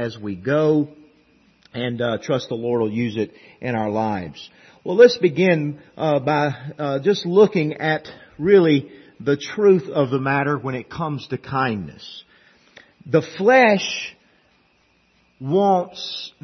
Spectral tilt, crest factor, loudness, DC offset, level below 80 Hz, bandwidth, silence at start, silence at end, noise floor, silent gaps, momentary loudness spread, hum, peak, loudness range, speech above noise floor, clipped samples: -6.5 dB/octave; 20 dB; -20 LUFS; under 0.1%; -62 dBFS; 6.4 kHz; 0 s; 0.15 s; -61 dBFS; none; 15 LU; none; -2 dBFS; 6 LU; 41 dB; under 0.1%